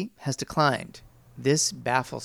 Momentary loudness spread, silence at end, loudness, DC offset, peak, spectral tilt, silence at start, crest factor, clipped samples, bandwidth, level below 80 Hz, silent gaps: 9 LU; 0 s; -26 LUFS; under 0.1%; -8 dBFS; -3.5 dB/octave; 0 s; 20 dB; under 0.1%; 16.5 kHz; -58 dBFS; none